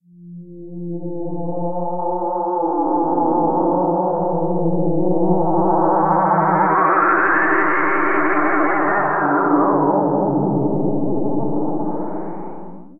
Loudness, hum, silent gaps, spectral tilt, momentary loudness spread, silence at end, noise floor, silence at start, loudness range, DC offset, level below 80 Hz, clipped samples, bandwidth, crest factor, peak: -18 LUFS; none; none; -13 dB/octave; 12 LU; 0 s; -38 dBFS; 0 s; 5 LU; 3%; -56 dBFS; under 0.1%; 3.1 kHz; 14 dB; -2 dBFS